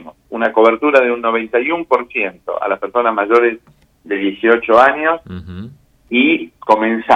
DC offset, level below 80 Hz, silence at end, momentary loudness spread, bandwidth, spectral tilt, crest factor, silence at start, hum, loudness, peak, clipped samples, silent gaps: under 0.1%; -54 dBFS; 0 s; 13 LU; 8 kHz; -6 dB/octave; 16 dB; 0 s; none; -15 LUFS; 0 dBFS; under 0.1%; none